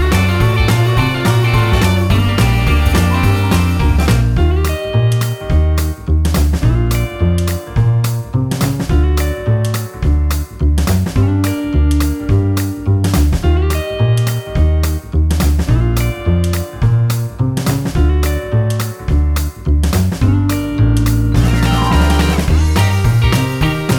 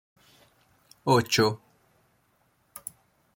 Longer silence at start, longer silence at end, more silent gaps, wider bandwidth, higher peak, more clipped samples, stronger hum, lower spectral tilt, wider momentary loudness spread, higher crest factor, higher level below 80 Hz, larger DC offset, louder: second, 0 s vs 1.05 s; second, 0 s vs 1.8 s; neither; first, over 20 kHz vs 16.5 kHz; first, 0 dBFS vs -8 dBFS; neither; neither; first, -6 dB/octave vs -4.5 dB/octave; second, 5 LU vs 20 LU; second, 12 dB vs 22 dB; first, -18 dBFS vs -66 dBFS; neither; first, -14 LUFS vs -24 LUFS